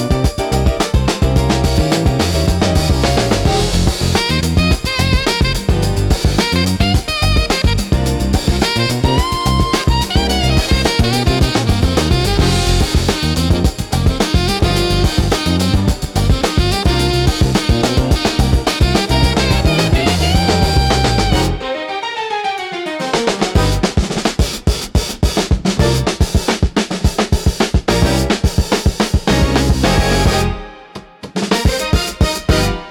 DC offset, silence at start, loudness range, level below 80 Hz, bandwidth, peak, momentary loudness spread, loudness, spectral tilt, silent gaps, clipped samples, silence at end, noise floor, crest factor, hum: under 0.1%; 0 s; 2 LU; -20 dBFS; 17.5 kHz; 0 dBFS; 4 LU; -15 LUFS; -5 dB/octave; none; under 0.1%; 0 s; -35 dBFS; 14 dB; none